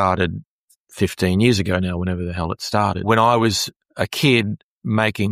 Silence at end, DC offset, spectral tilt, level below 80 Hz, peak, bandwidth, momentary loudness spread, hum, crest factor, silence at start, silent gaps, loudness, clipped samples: 0 s; under 0.1%; -5 dB/octave; -44 dBFS; -2 dBFS; 15.5 kHz; 10 LU; none; 18 dB; 0 s; 0.46-0.68 s, 0.76-0.85 s, 3.76-3.80 s, 4.63-4.82 s; -19 LUFS; under 0.1%